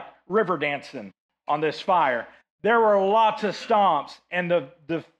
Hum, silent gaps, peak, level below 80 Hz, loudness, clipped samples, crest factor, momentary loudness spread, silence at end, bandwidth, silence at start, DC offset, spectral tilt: none; 1.18-1.29 s, 2.50-2.58 s; -8 dBFS; -72 dBFS; -23 LUFS; under 0.1%; 14 dB; 13 LU; 0.2 s; 9 kHz; 0 s; under 0.1%; -6 dB/octave